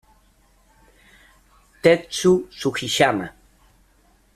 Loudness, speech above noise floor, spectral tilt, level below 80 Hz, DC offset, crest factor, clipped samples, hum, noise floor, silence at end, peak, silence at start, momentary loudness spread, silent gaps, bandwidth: -20 LUFS; 39 dB; -4.5 dB/octave; -56 dBFS; under 0.1%; 22 dB; under 0.1%; none; -58 dBFS; 1.05 s; -2 dBFS; 1.85 s; 9 LU; none; 14 kHz